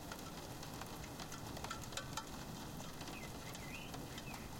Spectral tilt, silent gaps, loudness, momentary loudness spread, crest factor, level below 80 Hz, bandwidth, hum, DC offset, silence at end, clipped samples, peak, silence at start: -3.5 dB/octave; none; -48 LUFS; 4 LU; 22 dB; -60 dBFS; 17 kHz; none; under 0.1%; 0 s; under 0.1%; -26 dBFS; 0 s